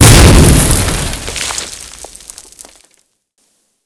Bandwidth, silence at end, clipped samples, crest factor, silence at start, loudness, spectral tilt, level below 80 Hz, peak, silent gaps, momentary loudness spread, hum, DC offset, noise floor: 11 kHz; 1.8 s; 4%; 10 dB; 0 s; -9 LUFS; -4 dB/octave; -16 dBFS; 0 dBFS; none; 26 LU; none; under 0.1%; -60 dBFS